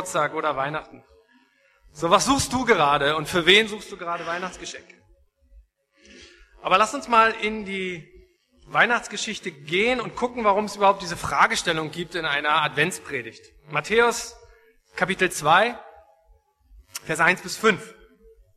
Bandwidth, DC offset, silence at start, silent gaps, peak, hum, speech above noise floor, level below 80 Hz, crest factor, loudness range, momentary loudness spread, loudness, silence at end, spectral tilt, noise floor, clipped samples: 13.5 kHz; under 0.1%; 0 s; none; -2 dBFS; none; 38 dB; -54 dBFS; 22 dB; 4 LU; 14 LU; -22 LUFS; 0.65 s; -3 dB/octave; -61 dBFS; under 0.1%